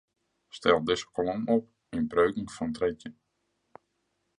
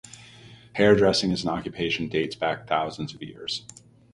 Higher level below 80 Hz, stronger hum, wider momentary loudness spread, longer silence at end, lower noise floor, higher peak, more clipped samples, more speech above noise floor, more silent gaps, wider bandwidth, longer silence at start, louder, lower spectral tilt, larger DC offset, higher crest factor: second, -58 dBFS vs -52 dBFS; neither; second, 13 LU vs 17 LU; first, 1.25 s vs 0.55 s; first, -77 dBFS vs -49 dBFS; second, -8 dBFS vs -4 dBFS; neither; first, 50 dB vs 24 dB; neither; about the same, 10.5 kHz vs 11.5 kHz; first, 0.55 s vs 0.05 s; second, -29 LUFS vs -25 LUFS; about the same, -5.5 dB/octave vs -5 dB/octave; neither; about the same, 22 dB vs 22 dB